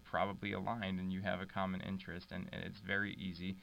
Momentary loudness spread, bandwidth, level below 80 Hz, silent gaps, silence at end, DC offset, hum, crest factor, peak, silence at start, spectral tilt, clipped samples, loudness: 8 LU; 8.6 kHz; -68 dBFS; none; 0 s; under 0.1%; none; 18 dB; -22 dBFS; 0 s; -7 dB/octave; under 0.1%; -41 LUFS